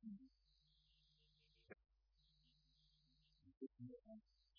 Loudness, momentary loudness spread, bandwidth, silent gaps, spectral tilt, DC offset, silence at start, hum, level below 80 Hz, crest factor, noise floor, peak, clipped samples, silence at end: -62 LUFS; 10 LU; 5.4 kHz; 3.57-3.61 s; -6.5 dB/octave; under 0.1%; 0 s; none; -84 dBFS; 22 dB; -80 dBFS; -42 dBFS; under 0.1%; 0 s